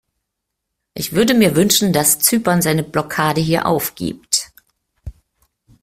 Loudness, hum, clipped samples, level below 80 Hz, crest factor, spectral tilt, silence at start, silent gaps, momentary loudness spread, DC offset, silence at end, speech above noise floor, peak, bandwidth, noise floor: -16 LUFS; none; under 0.1%; -46 dBFS; 18 dB; -3.5 dB/octave; 0.95 s; none; 11 LU; under 0.1%; 0.7 s; 62 dB; 0 dBFS; 16 kHz; -78 dBFS